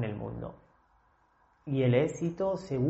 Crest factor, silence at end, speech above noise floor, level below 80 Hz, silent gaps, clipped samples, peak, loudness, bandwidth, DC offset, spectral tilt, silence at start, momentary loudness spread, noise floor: 20 dB; 0 s; 39 dB; -58 dBFS; none; under 0.1%; -12 dBFS; -31 LUFS; 8 kHz; under 0.1%; -7.5 dB/octave; 0 s; 17 LU; -67 dBFS